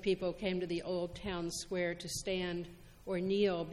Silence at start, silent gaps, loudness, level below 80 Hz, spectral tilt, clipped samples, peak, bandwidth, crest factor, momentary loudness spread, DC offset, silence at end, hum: 0 s; none; -37 LUFS; -56 dBFS; -4.5 dB/octave; under 0.1%; -22 dBFS; 14 kHz; 16 dB; 8 LU; under 0.1%; 0 s; none